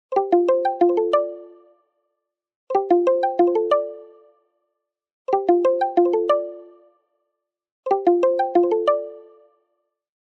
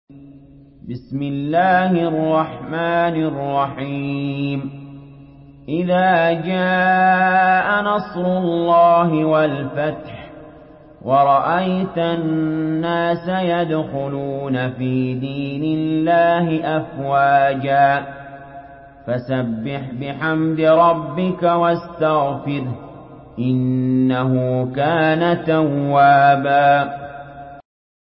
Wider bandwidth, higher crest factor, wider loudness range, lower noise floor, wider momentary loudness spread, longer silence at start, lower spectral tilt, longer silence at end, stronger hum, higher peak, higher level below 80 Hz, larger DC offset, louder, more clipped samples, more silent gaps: first, 6.2 kHz vs 5.6 kHz; about the same, 16 dB vs 14 dB; second, 2 LU vs 5 LU; first, -80 dBFS vs -43 dBFS; about the same, 13 LU vs 14 LU; about the same, 0.1 s vs 0.1 s; second, -6 dB/octave vs -12 dB/octave; first, 1.1 s vs 0.45 s; neither; second, -6 dBFS vs -2 dBFS; second, -84 dBFS vs -52 dBFS; neither; about the same, -20 LUFS vs -18 LUFS; neither; first, 2.56-2.67 s, 5.12-5.25 s, 7.72-7.83 s vs none